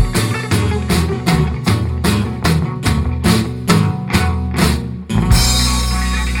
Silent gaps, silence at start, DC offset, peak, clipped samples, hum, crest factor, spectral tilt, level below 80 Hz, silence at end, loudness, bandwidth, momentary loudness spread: none; 0 s; under 0.1%; 0 dBFS; under 0.1%; none; 14 dB; -5 dB/octave; -22 dBFS; 0 s; -16 LUFS; 17 kHz; 5 LU